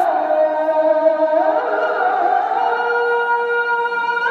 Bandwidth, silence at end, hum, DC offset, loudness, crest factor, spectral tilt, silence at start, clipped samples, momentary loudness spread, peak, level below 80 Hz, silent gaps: 6.4 kHz; 0 s; none; under 0.1%; -17 LUFS; 12 dB; -4 dB/octave; 0 s; under 0.1%; 3 LU; -4 dBFS; -86 dBFS; none